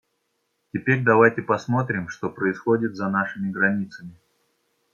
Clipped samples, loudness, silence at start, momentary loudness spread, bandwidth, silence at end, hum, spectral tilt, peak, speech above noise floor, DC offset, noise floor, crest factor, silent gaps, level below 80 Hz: under 0.1%; -22 LUFS; 0.75 s; 13 LU; 7.2 kHz; 0.85 s; none; -8 dB/octave; -2 dBFS; 51 dB; under 0.1%; -73 dBFS; 20 dB; none; -66 dBFS